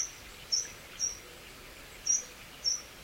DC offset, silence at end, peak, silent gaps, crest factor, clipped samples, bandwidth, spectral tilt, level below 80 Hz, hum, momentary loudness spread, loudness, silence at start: under 0.1%; 0 s; -16 dBFS; none; 20 dB; under 0.1%; 16.5 kHz; 1 dB/octave; -60 dBFS; none; 18 LU; -32 LUFS; 0 s